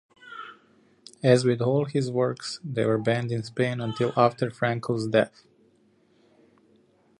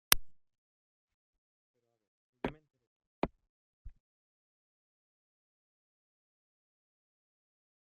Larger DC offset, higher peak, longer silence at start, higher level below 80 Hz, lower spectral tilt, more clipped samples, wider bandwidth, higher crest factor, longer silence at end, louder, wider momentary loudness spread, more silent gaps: neither; second, -6 dBFS vs 0 dBFS; first, 0.25 s vs 0.1 s; second, -66 dBFS vs -58 dBFS; first, -6.5 dB/octave vs -1 dB/octave; neither; first, 11 kHz vs 3.1 kHz; second, 22 dB vs 44 dB; second, 1.95 s vs 4 s; first, -25 LUFS vs -36 LUFS; about the same, 14 LU vs 13 LU; second, none vs 0.58-1.08 s, 1.14-1.74 s, 2.08-2.33 s, 2.87-3.00 s, 3.07-3.22 s, 3.49-3.85 s